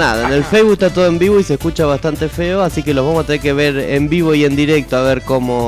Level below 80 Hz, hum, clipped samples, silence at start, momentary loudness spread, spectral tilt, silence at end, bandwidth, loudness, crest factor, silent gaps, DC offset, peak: -32 dBFS; none; under 0.1%; 0 s; 5 LU; -6 dB/octave; 0 s; 16 kHz; -14 LUFS; 10 dB; none; under 0.1%; -4 dBFS